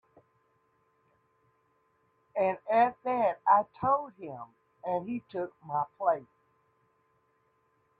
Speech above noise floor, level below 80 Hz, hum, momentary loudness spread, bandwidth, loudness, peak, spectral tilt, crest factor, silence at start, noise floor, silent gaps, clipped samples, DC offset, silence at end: 42 dB; -74 dBFS; none; 17 LU; 4.7 kHz; -30 LUFS; -10 dBFS; -9 dB/octave; 22 dB; 2.35 s; -72 dBFS; none; under 0.1%; under 0.1%; 1.75 s